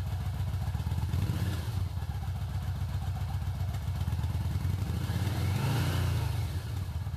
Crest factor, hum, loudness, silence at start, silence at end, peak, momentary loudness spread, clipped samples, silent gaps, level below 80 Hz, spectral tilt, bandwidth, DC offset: 12 dB; none; -33 LUFS; 0 s; 0 s; -18 dBFS; 5 LU; under 0.1%; none; -42 dBFS; -6.5 dB/octave; 15 kHz; under 0.1%